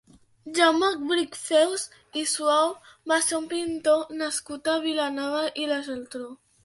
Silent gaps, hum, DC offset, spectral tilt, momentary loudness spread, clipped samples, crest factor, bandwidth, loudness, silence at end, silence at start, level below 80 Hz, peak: none; none; under 0.1%; -1 dB/octave; 11 LU; under 0.1%; 20 dB; 12 kHz; -25 LUFS; 0.3 s; 0.45 s; -68 dBFS; -6 dBFS